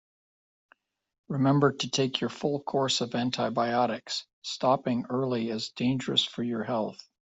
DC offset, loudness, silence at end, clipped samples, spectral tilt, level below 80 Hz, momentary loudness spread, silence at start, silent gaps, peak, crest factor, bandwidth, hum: under 0.1%; -28 LUFS; 0.25 s; under 0.1%; -5 dB/octave; -70 dBFS; 7 LU; 1.3 s; 4.33-4.42 s; -10 dBFS; 20 dB; 8.2 kHz; none